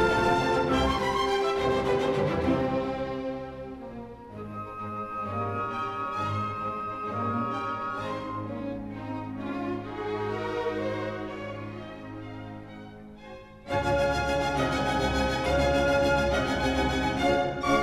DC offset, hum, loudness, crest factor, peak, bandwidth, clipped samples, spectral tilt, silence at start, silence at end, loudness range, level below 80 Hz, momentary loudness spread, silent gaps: under 0.1%; none; -28 LUFS; 16 dB; -12 dBFS; 15.5 kHz; under 0.1%; -5.5 dB/octave; 0 s; 0 s; 8 LU; -42 dBFS; 16 LU; none